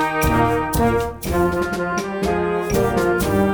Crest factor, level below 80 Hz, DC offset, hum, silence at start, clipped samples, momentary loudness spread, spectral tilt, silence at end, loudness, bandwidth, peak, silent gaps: 16 dB; -32 dBFS; under 0.1%; none; 0 s; under 0.1%; 5 LU; -6 dB/octave; 0 s; -20 LUFS; over 20 kHz; -4 dBFS; none